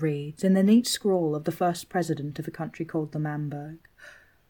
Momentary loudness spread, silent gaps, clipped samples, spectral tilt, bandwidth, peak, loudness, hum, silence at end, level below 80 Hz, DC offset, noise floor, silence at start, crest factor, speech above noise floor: 14 LU; none; under 0.1%; -6 dB/octave; 19 kHz; -10 dBFS; -26 LUFS; none; 0.4 s; -66 dBFS; under 0.1%; -52 dBFS; 0 s; 16 dB; 26 dB